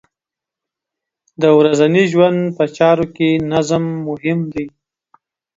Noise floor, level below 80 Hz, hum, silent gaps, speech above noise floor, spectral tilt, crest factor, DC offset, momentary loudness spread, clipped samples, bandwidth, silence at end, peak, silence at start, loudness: -86 dBFS; -54 dBFS; none; none; 72 dB; -6.5 dB/octave; 16 dB; under 0.1%; 10 LU; under 0.1%; 7.8 kHz; 0.9 s; 0 dBFS; 1.4 s; -15 LUFS